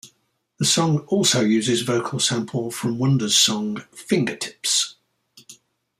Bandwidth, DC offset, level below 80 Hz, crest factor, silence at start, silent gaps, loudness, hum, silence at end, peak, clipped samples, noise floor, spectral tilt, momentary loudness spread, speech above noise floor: 15.5 kHz; under 0.1%; -64 dBFS; 18 dB; 0.05 s; none; -20 LUFS; none; 0.45 s; -4 dBFS; under 0.1%; -68 dBFS; -3.5 dB/octave; 10 LU; 47 dB